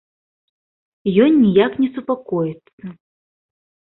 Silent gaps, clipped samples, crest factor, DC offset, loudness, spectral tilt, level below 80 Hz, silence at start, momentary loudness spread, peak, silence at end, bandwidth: 2.73-2.78 s; under 0.1%; 18 dB; under 0.1%; -17 LUFS; -12 dB/octave; -60 dBFS; 1.05 s; 24 LU; -2 dBFS; 1.05 s; 4.1 kHz